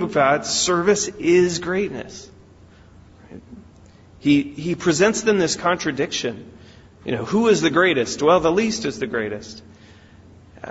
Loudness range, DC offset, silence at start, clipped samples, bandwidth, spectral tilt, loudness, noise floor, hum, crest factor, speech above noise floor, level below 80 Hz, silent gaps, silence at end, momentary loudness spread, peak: 5 LU; under 0.1%; 0 s; under 0.1%; 8 kHz; -4 dB/octave; -19 LUFS; -48 dBFS; none; 18 dB; 28 dB; -52 dBFS; none; 0 s; 17 LU; -4 dBFS